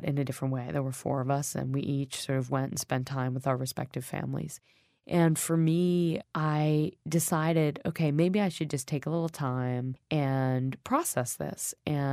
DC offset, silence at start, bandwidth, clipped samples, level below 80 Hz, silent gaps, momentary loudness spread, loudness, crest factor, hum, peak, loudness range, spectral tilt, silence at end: under 0.1%; 0 s; 15.5 kHz; under 0.1%; -64 dBFS; none; 8 LU; -30 LUFS; 18 dB; none; -12 dBFS; 4 LU; -6 dB/octave; 0 s